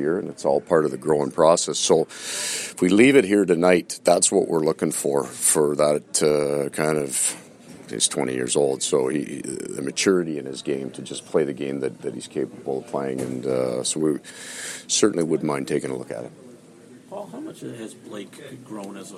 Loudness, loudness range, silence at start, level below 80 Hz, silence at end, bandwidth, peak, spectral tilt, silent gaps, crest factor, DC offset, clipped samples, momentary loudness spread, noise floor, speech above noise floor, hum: -22 LUFS; 8 LU; 0 s; -64 dBFS; 0 s; 15.5 kHz; -2 dBFS; -3.5 dB/octave; none; 20 dB; under 0.1%; under 0.1%; 17 LU; -47 dBFS; 25 dB; none